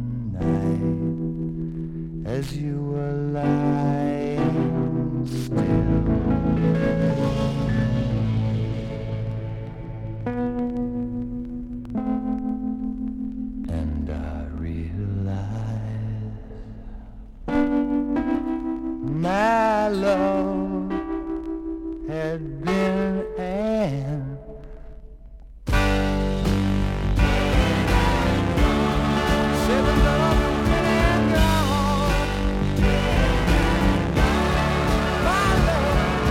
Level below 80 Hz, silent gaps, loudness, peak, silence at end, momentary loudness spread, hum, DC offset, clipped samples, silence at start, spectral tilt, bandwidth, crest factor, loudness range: -30 dBFS; none; -23 LUFS; -6 dBFS; 0 s; 11 LU; none; under 0.1%; under 0.1%; 0 s; -6.5 dB/octave; 16 kHz; 16 dB; 8 LU